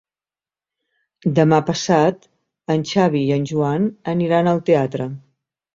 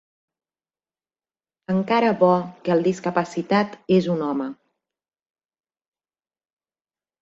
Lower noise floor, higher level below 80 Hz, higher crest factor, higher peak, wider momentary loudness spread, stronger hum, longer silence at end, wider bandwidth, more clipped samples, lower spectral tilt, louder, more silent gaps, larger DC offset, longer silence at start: about the same, under -90 dBFS vs under -90 dBFS; first, -58 dBFS vs -66 dBFS; about the same, 18 dB vs 18 dB; first, -2 dBFS vs -6 dBFS; first, 11 LU vs 8 LU; neither; second, 0.55 s vs 2.7 s; about the same, 7.8 kHz vs 7.8 kHz; neither; about the same, -6.5 dB/octave vs -7 dB/octave; first, -18 LUFS vs -21 LUFS; neither; neither; second, 1.25 s vs 1.7 s